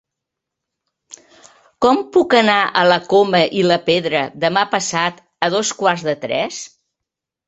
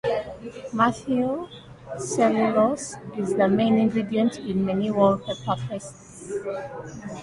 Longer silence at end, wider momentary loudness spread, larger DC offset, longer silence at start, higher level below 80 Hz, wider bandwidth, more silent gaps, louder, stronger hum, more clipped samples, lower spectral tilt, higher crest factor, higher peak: first, 0.8 s vs 0 s; second, 8 LU vs 16 LU; neither; first, 1.1 s vs 0.05 s; about the same, -60 dBFS vs -56 dBFS; second, 8.4 kHz vs 11.5 kHz; neither; first, -16 LUFS vs -24 LUFS; neither; neither; second, -3.5 dB/octave vs -6 dB/octave; about the same, 18 dB vs 18 dB; first, 0 dBFS vs -6 dBFS